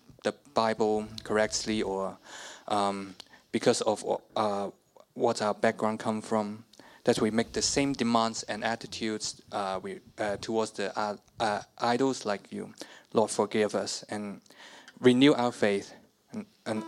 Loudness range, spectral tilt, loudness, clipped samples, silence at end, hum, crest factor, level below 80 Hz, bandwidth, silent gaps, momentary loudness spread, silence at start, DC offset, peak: 4 LU; -4 dB/octave; -29 LUFS; under 0.1%; 0 s; none; 22 dB; -62 dBFS; 14 kHz; none; 16 LU; 0.25 s; under 0.1%; -8 dBFS